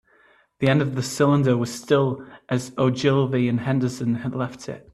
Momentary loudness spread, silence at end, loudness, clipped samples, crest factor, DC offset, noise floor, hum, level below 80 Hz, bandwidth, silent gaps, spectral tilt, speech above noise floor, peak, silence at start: 8 LU; 0.15 s; -22 LUFS; under 0.1%; 16 dB; under 0.1%; -58 dBFS; none; -60 dBFS; 13 kHz; none; -6.5 dB/octave; 36 dB; -6 dBFS; 0.6 s